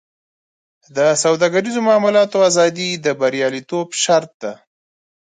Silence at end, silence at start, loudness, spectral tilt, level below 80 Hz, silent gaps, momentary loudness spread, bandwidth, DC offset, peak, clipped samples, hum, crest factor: 0.85 s; 0.95 s; -16 LUFS; -3.5 dB/octave; -70 dBFS; 4.34-4.40 s; 11 LU; 9.6 kHz; under 0.1%; -2 dBFS; under 0.1%; none; 16 dB